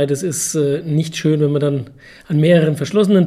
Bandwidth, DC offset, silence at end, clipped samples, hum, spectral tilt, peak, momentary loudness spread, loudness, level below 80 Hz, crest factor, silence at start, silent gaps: 15 kHz; under 0.1%; 0 s; under 0.1%; none; -6 dB/octave; -2 dBFS; 8 LU; -17 LUFS; -56 dBFS; 14 dB; 0 s; none